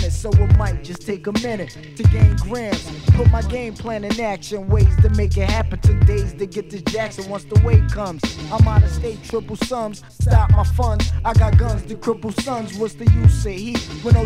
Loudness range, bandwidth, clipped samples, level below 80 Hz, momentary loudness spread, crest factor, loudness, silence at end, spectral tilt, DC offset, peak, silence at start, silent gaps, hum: 1 LU; 11.5 kHz; under 0.1%; -22 dBFS; 12 LU; 16 dB; -18 LUFS; 0 s; -7 dB/octave; under 0.1%; 0 dBFS; 0 s; none; none